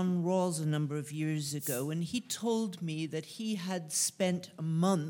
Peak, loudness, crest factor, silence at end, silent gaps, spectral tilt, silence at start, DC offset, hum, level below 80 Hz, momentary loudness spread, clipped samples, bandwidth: -16 dBFS; -34 LUFS; 16 dB; 0 s; none; -5 dB/octave; 0 s; under 0.1%; none; -78 dBFS; 7 LU; under 0.1%; 17.5 kHz